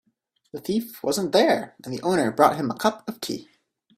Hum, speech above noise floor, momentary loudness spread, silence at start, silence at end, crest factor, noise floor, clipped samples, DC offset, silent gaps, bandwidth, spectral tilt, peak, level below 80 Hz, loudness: none; 47 dB; 14 LU; 0.55 s; 0.55 s; 22 dB; -71 dBFS; under 0.1%; under 0.1%; none; 16 kHz; -4.5 dB/octave; -2 dBFS; -64 dBFS; -23 LUFS